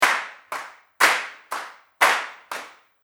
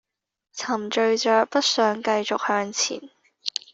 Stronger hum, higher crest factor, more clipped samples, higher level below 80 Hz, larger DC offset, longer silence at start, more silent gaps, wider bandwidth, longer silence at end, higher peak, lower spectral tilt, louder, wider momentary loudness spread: neither; about the same, 24 dB vs 20 dB; neither; about the same, -76 dBFS vs -72 dBFS; neither; second, 0 s vs 0.55 s; neither; first, over 20 kHz vs 8 kHz; about the same, 0.35 s vs 0.25 s; about the same, -2 dBFS vs -4 dBFS; second, 1 dB/octave vs -2 dB/octave; about the same, -22 LUFS vs -23 LUFS; first, 16 LU vs 13 LU